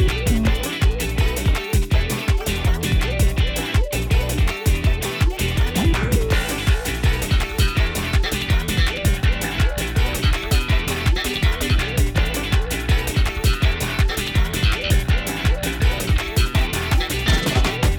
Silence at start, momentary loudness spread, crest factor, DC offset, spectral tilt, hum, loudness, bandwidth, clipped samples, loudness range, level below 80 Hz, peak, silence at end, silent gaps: 0 s; 2 LU; 12 dB; under 0.1%; -4.5 dB/octave; none; -20 LUFS; 19.5 kHz; under 0.1%; 0 LU; -22 dBFS; -6 dBFS; 0 s; none